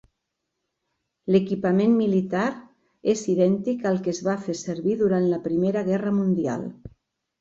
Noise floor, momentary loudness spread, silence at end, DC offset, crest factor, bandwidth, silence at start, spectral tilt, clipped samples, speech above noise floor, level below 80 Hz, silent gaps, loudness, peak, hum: -80 dBFS; 8 LU; 0.55 s; under 0.1%; 18 dB; 7.8 kHz; 1.25 s; -7 dB/octave; under 0.1%; 58 dB; -62 dBFS; none; -23 LUFS; -6 dBFS; none